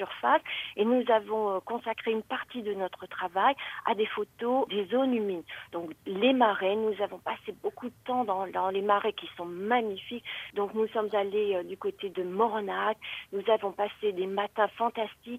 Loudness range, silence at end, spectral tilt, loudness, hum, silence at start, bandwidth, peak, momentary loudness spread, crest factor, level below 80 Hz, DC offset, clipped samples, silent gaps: 2 LU; 0 s; -6 dB/octave; -30 LUFS; none; 0 s; 15.5 kHz; -10 dBFS; 10 LU; 20 dB; -72 dBFS; under 0.1%; under 0.1%; none